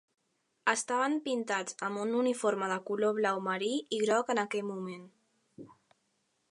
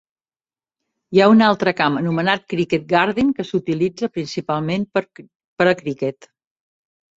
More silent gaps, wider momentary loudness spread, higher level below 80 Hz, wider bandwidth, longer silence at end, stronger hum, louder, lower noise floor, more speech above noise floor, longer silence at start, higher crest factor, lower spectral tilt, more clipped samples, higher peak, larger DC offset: second, none vs 5.35-5.56 s; second, 7 LU vs 11 LU; second, -86 dBFS vs -58 dBFS; first, 11.5 kHz vs 7.8 kHz; second, 0.8 s vs 1.05 s; neither; second, -32 LUFS vs -19 LUFS; second, -77 dBFS vs under -90 dBFS; second, 46 dB vs over 72 dB; second, 0.65 s vs 1.1 s; about the same, 22 dB vs 18 dB; second, -3.5 dB/octave vs -6.5 dB/octave; neither; second, -12 dBFS vs -2 dBFS; neither